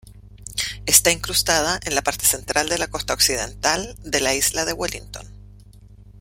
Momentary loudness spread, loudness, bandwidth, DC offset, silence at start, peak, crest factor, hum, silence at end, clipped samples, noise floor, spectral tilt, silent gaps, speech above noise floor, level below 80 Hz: 13 LU; -19 LUFS; 16.5 kHz; under 0.1%; 0.05 s; 0 dBFS; 22 dB; 50 Hz at -40 dBFS; 0 s; under 0.1%; -45 dBFS; -1 dB/octave; none; 24 dB; -42 dBFS